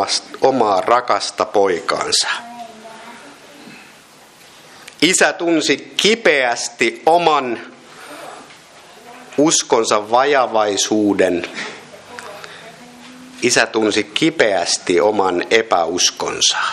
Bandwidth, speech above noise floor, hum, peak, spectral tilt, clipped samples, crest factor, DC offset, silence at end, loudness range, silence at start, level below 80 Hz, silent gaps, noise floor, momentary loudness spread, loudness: 14 kHz; 29 dB; none; 0 dBFS; -2 dB/octave; under 0.1%; 18 dB; under 0.1%; 0 s; 5 LU; 0 s; -62 dBFS; none; -44 dBFS; 20 LU; -15 LUFS